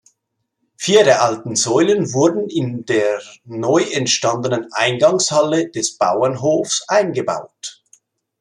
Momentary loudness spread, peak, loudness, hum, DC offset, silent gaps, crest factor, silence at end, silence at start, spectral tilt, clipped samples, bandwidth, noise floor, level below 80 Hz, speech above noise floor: 10 LU; 0 dBFS; -17 LUFS; none; under 0.1%; none; 16 dB; 0.7 s; 0.8 s; -3.5 dB/octave; under 0.1%; 11.5 kHz; -74 dBFS; -64 dBFS; 57 dB